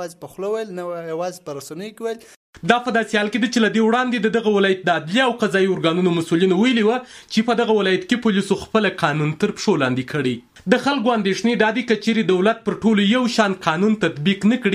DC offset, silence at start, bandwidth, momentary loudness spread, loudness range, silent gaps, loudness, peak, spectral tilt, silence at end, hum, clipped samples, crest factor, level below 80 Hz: under 0.1%; 0 s; 13 kHz; 11 LU; 3 LU; 2.36-2.53 s; -19 LUFS; -2 dBFS; -5.5 dB/octave; 0 s; none; under 0.1%; 18 dB; -58 dBFS